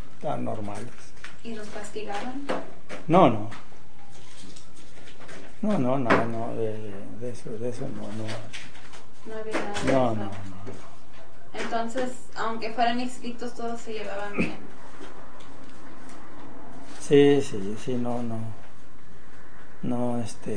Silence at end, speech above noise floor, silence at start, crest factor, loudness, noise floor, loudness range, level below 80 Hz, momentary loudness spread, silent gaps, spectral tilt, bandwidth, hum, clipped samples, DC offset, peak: 0 s; 24 dB; 0 s; 24 dB; -28 LUFS; -51 dBFS; 8 LU; -58 dBFS; 24 LU; none; -6 dB/octave; 10 kHz; none; under 0.1%; 6%; -4 dBFS